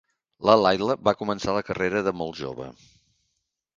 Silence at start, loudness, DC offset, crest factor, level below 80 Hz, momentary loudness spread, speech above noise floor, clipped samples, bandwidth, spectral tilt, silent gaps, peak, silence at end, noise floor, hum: 0.4 s; -24 LUFS; under 0.1%; 22 dB; -56 dBFS; 16 LU; 54 dB; under 0.1%; 7.6 kHz; -5.5 dB/octave; none; -2 dBFS; 1.05 s; -78 dBFS; none